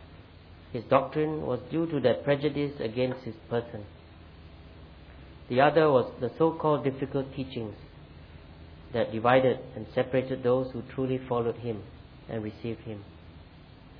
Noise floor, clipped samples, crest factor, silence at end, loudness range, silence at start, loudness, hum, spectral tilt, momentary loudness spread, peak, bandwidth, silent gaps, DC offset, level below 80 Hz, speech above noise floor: -51 dBFS; under 0.1%; 22 dB; 0 s; 5 LU; 0 s; -29 LUFS; none; -10 dB/octave; 26 LU; -8 dBFS; 5.2 kHz; none; under 0.1%; -54 dBFS; 23 dB